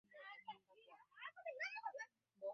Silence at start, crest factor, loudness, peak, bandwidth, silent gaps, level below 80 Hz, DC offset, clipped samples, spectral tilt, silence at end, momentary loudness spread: 0.1 s; 18 dB; -52 LUFS; -36 dBFS; 6.4 kHz; none; under -90 dBFS; under 0.1%; under 0.1%; 2 dB/octave; 0 s; 18 LU